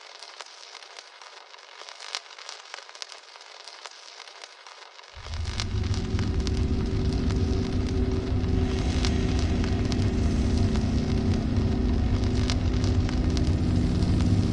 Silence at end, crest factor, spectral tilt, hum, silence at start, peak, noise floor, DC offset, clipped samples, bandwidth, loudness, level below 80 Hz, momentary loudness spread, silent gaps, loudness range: 0 s; 20 dB; -6.5 dB/octave; none; 0 s; -6 dBFS; -47 dBFS; under 0.1%; under 0.1%; 10.5 kHz; -27 LUFS; -32 dBFS; 18 LU; none; 14 LU